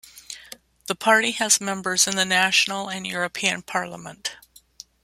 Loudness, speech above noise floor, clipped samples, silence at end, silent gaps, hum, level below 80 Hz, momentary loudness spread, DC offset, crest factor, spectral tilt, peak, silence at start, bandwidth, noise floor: -21 LUFS; 25 dB; under 0.1%; 0.7 s; none; none; -66 dBFS; 19 LU; under 0.1%; 22 dB; -1 dB/octave; -2 dBFS; 0.05 s; 16 kHz; -48 dBFS